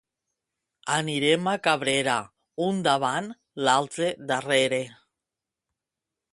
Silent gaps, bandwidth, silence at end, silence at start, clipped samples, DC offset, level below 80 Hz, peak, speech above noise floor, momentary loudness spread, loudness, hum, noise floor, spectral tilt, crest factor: none; 11.5 kHz; 1.4 s; 0.85 s; under 0.1%; under 0.1%; -70 dBFS; -6 dBFS; 63 dB; 8 LU; -25 LUFS; none; -88 dBFS; -3.5 dB/octave; 22 dB